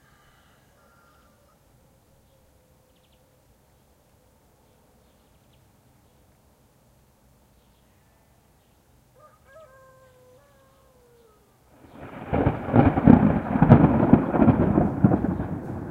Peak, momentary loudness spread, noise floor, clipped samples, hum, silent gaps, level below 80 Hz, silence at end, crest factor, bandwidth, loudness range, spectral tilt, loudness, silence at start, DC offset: 0 dBFS; 16 LU; -60 dBFS; under 0.1%; none; none; -42 dBFS; 0 s; 26 dB; 4.4 kHz; 12 LU; -10.5 dB/octave; -20 LUFS; 12 s; under 0.1%